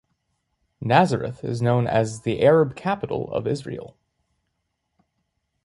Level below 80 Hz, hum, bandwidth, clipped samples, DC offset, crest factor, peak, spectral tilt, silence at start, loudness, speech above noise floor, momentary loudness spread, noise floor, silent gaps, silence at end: -56 dBFS; none; 11.5 kHz; under 0.1%; under 0.1%; 20 dB; -4 dBFS; -7 dB/octave; 0.8 s; -22 LUFS; 55 dB; 12 LU; -76 dBFS; none; 1.75 s